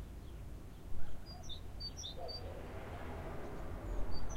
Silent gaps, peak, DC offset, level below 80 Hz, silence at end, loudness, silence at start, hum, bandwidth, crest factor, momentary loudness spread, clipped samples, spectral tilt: none; -22 dBFS; under 0.1%; -48 dBFS; 0 s; -48 LUFS; 0 s; none; 14.5 kHz; 16 dB; 7 LU; under 0.1%; -4.5 dB/octave